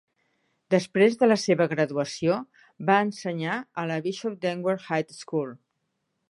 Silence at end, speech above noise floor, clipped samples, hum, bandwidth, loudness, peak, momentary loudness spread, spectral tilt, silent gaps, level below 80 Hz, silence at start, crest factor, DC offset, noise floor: 0.75 s; 53 dB; under 0.1%; none; 11.5 kHz; -26 LUFS; -6 dBFS; 10 LU; -5.5 dB/octave; none; -74 dBFS; 0.7 s; 20 dB; under 0.1%; -78 dBFS